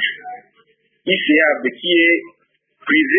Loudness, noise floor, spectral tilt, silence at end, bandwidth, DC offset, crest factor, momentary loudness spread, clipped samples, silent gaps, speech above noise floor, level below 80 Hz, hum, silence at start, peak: -15 LUFS; -59 dBFS; -9 dB/octave; 0 s; 3.7 kHz; under 0.1%; 16 dB; 18 LU; under 0.1%; none; 44 dB; -72 dBFS; none; 0 s; -2 dBFS